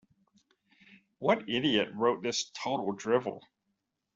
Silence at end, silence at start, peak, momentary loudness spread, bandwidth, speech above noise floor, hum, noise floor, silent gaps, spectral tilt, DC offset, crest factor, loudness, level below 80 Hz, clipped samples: 0.75 s; 1.2 s; -12 dBFS; 6 LU; 7.8 kHz; 52 dB; none; -82 dBFS; none; -4 dB/octave; under 0.1%; 22 dB; -31 LUFS; -72 dBFS; under 0.1%